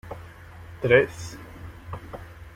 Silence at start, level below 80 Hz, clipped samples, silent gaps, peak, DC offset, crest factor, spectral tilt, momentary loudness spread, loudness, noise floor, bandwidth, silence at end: 0.05 s; -50 dBFS; under 0.1%; none; -4 dBFS; under 0.1%; 24 dB; -6 dB/octave; 24 LU; -22 LUFS; -44 dBFS; 15.5 kHz; 0.05 s